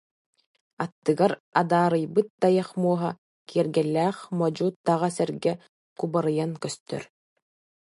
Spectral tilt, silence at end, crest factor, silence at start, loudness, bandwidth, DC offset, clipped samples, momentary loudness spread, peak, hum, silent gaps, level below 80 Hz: -6.5 dB/octave; 0.9 s; 20 dB; 0.8 s; -26 LUFS; 11.5 kHz; under 0.1%; under 0.1%; 11 LU; -6 dBFS; none; 0.92-1.02 s, 1.40-1.52 s, 2.30-2.38 s, 3.18-3.46 s, 4.76-4.84 s, 5.69-5.96 s, 6.80-6.86 s; -72 dBFS